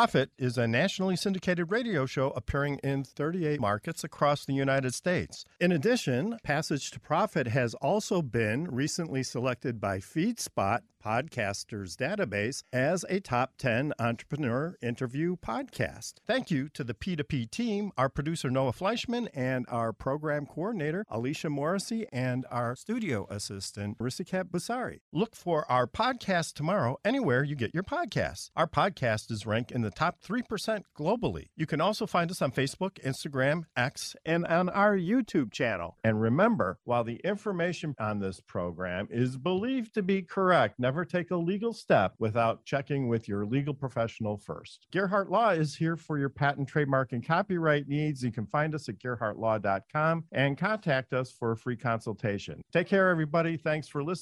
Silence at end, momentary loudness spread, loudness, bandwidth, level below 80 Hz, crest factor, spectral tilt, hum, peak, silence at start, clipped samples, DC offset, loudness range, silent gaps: 0 s; 7 LU; -30 LUFS; 14.5 kHz; -58 dBFS; 20 dB; -6 dB/octave; none; -10 dBFS; 0 s; under 0.1%; under 0.1%; 4 LU; 25.01-25.12 s